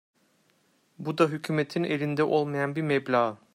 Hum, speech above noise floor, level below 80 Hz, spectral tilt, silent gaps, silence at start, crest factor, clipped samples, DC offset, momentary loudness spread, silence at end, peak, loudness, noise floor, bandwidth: none; 41 dB; -72 dBFS; -7 dB/octave; none; 1 s; 18 dB; under 0.1%; under 0.1%; 4 LU; 0.2 s; -10 dBFS; -27 LUFS; -67 dBFS; 15.5 kHz